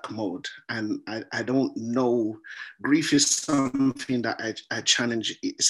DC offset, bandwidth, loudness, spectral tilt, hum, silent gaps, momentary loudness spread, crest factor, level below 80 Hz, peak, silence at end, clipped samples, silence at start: under 0.1%; 12.5 kHz; -25 LUFS; -3 dB/octave; none; none; 11 LU; 18 dB; -66 dBFS; -8 dBFS; 0 s; under 0.1%; 0.05 s